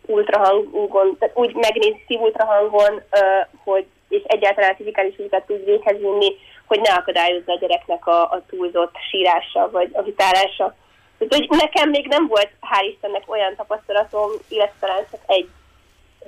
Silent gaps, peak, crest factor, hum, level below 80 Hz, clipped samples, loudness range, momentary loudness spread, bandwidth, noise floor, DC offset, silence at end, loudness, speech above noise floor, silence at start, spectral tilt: none; -6 dBFS; 12 dB; none; -56 dBFS; under 0.1%; 3 LU; 8 LU; 15 kHz; -54 dBFS; under 0.1%; 0.8 s; -18 LUFS; 36 dB; 0.1 s; -2.5 dB/octave